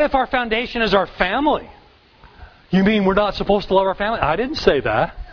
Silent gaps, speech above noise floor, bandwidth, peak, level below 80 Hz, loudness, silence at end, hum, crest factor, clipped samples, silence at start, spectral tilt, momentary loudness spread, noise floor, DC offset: none; 30 dB; 5.4 kHz; 0 dBFS; -38 dBFS; -18 LUFS; 0 s; none; 18 dB; under 0.1%; 0 s; -6.5 dB/octave; 4 LU; -48 dBFS; under 0.1%